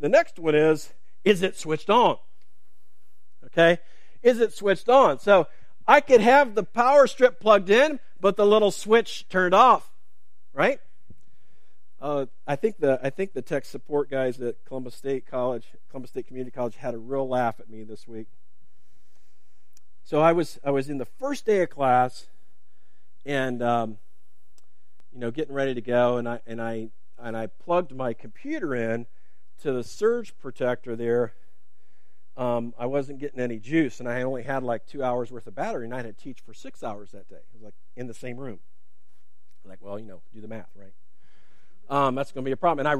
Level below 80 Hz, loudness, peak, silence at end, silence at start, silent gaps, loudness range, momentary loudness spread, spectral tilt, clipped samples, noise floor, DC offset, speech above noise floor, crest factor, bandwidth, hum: -68 dBFS; -24 LUFS; 0 dBFS; 0 s; 0 s; none; 15 LU; 19 LU; -5.5 dB/octave; under 0.1%; -74 dBFS; 2%; 50 dB; 24 dB; 14.5 kHz; none